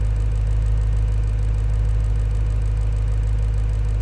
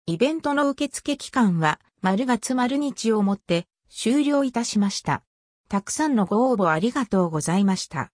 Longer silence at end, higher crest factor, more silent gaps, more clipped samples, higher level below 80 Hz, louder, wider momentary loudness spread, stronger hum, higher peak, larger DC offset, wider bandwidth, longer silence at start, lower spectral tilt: about the same, 0 s vs 0.1 s; second, 8 dB vs 16 dB; second, none vs 5.27-5.64 s; neither; first, -20 dBFS vs -60 dBFS; about the same, -23 LUFS vs -23 LUFS; second, 1 LU vs 7 LU; neither; second, -12 dBFS vs -6 dBFS; neither; second, 8.6 kHz vs 10.5 kHz; about the same, 0 s vs 0.05 s; first, -7.5 dB/octave vs -5 dB/octave